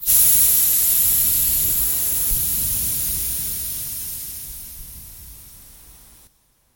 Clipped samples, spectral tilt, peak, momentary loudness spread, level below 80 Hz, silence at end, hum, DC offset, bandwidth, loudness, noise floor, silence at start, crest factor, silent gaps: under 0.1%; -0.5 dB/octave; -2 dBFS; 21 LU; -38 dBFS; 0.85 s; none; under 0.1%; 17 kHz; -16 LUFS; -59 dBFS; 0 s; 20 dB; none